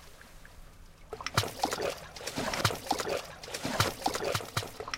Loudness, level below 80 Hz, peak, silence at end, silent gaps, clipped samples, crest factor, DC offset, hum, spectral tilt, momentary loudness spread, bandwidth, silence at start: -33 LUFS; -54 dBFS; -10 dBFS; 0 s; none; under 0.1%; 24 dB; under 0.1%; none; -3.5 dB/octave; 17 LU; 17 kHz; 0 s